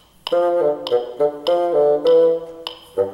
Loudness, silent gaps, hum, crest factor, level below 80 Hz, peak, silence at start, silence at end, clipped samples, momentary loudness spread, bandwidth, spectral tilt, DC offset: -18 LUFS; none; none; 12 dB; -62 dBFS; -6 dBFS; 0.25 s; 0 s; under 0.1%; 11 LU; 12 kHz; -5.5 dB/octave; under 0.1%